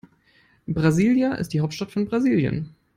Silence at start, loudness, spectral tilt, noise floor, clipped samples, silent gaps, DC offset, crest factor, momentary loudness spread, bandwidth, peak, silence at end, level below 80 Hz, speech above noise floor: 0.7 s; -22 LUFS; -7 dB/octave; -60 dBFS; under 0.1%; none; under 0.1%; 18 dB; 10 LU; 15.5 kHz; -6 dBFS; 0.3 s; -52 dBFS; 38 dB